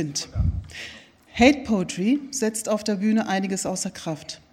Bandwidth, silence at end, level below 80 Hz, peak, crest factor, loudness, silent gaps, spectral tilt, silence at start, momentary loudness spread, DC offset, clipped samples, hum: 15.5 kHz; 0.15 s; -38 dBFS; -2 dBFS; 22 dB; -24 LUFS; none; -4.5 dB/octave; 0 s; 16 LU; under 0.1%; under 0.1%; none